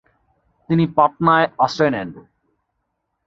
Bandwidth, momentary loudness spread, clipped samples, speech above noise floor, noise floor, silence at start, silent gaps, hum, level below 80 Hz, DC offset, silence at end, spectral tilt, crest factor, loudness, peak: 7.6 kHz; 8 LU; under 0.1%; 57 dB; -74 dBFS; 0.7 s; none; none; -54 dBFS; under 0.1%; 1.1 s; -7 dB/octave; 18 dB; -17 LUFS; -2 dBFS